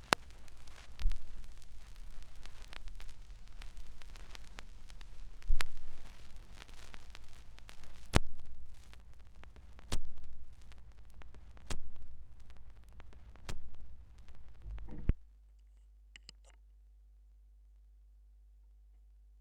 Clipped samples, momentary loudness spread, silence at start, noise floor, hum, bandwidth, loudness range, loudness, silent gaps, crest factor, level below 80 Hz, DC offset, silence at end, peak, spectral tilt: under 0.1%; 23 LU; 0.05 s; -60 dBFS; none; 12 kHz; 11 LU; -46 LUFS; none; 32 dB; -44 dBFS; under 0.1%; 4.15 s; -2 dBFS; -4 dB/octave